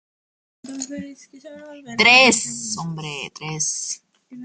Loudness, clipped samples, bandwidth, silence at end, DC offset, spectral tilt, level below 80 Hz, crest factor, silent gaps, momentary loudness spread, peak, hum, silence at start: -17 LUFS; under 0.1%; 10.5 kHz; 0 s; under 0.1%; -1.5 dB/octave; -66 dBFS; 22 dB; none; 25 LU; 0 dBFS; none; 0.65 s